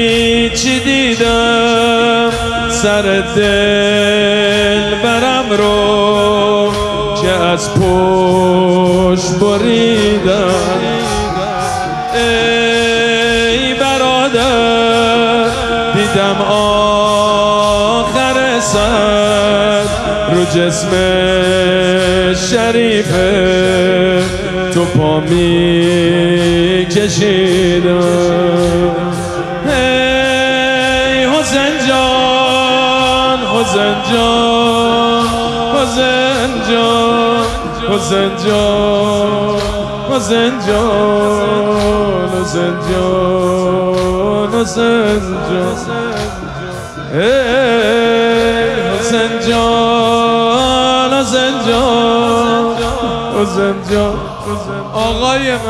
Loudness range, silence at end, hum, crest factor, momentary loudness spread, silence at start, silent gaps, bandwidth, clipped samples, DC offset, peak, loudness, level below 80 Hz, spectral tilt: 3 LU; 0 s; none; 12 dB; 5 LU; 0 s; none; 14 kHz; under 0.1%; under 0.1%; 0 dBFS; -11 LUFS; -32 dBFS; -4.5 dB/octave